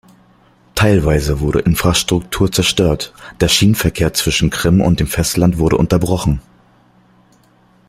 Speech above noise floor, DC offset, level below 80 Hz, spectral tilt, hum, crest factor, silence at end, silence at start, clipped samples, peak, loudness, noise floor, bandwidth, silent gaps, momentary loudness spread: 37 dB; under 0.1%; -30 dBFS; -5 dB/octave; none; 16 dB; 1.5 s; 0.75 s; under 0.1%; 0 dBFS; -14 LUFS; -51 dBFS; 16 kHz; none; 6 LU